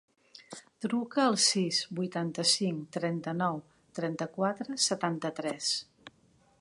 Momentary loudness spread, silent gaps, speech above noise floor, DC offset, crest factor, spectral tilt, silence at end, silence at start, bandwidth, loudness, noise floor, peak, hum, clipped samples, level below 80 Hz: 13 LU; none; 35 dB; under 0.1%; 20 dB; -3.5 dB/octave; 0.5 s; 0.35 s; 11.5 kHz; -30 LUFS; -66 dBFS; -14 dBFS; none; under 0.1%; -78 dBFS